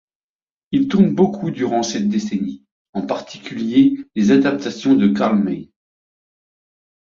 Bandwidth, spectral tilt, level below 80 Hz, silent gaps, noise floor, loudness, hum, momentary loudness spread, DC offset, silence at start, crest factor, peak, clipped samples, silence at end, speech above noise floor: 7.4 kHz; -6.5 dB/octave; -58 dBFS; 2.71-2.93 s; under -90 dBFS; -18 LUFS; none; 12 LU; under 0.1%; 0.7 s; 16 dB; -2 dBFS; under 0.1%; 1.4 s; over 73 dB